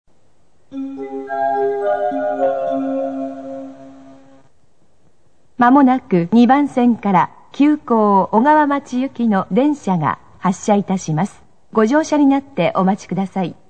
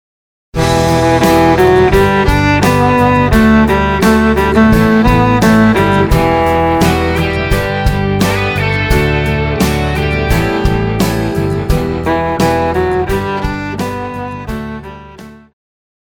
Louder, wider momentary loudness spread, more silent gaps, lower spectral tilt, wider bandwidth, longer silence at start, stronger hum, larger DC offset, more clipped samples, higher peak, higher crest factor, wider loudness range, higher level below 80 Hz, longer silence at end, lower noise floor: second, -16 LUFS vs -11 LUFS; first, 14 LU vs 10 LU; neither; about the same, -7 dB/octave vs -6 dB/octave; second, 9 kHz vs over 20 kHz; first, 0.7 s vs 0.55 s; neither; first, 0.5% vs under 0.1%; neither; about the same, 0 dBFS vs 0 dBFS; about the same, 16 dB vs 12 dB; about the same, 8 LU vs 6 LU; second, -60 dBFS vs -22 dBFS; second, 0.15 s vs 0.7 s; first, -60 dBFS vs -34 dBFS